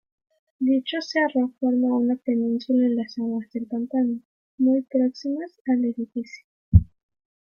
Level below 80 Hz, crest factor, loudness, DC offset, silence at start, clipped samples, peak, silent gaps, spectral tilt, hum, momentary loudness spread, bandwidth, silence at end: -40 dBFS; 22 dB; -24 LUFS; under 0.1%; 0.6 s; under 0.1%; -2 dBFS; 4.25-4.58 s, 5.61-5.65 s, 6.44-6.72 s; -8 dB/octave; none; 10 LU; 6.8 kHz; 0.6 s